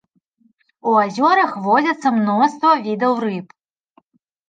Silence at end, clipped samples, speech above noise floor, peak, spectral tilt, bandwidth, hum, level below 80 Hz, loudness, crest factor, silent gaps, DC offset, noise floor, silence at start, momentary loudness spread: 1.05 s; under 0.1%; 44 dB; -2 dBFS; -6 dB/octave; 9.2 kHz; none; -74 dBFS; -17 LUFS; 16 dB; none; under 0.1%; -61 dBFS; 0.85 s; 8 LU